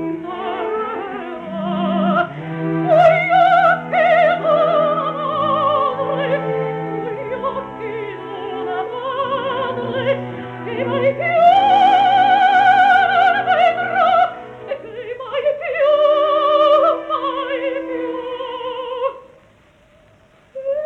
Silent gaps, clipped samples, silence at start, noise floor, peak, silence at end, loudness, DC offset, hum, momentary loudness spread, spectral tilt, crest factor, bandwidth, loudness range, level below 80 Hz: none; under 0.1%; 0 s; -51 dBFS; -2 dBFS; 0 s; -17 LUFS; under 0.1%; none; 15 LU; -6.5 dB/octave; 16 dB; 7.4 kHz; 10 LU; -58 dBFS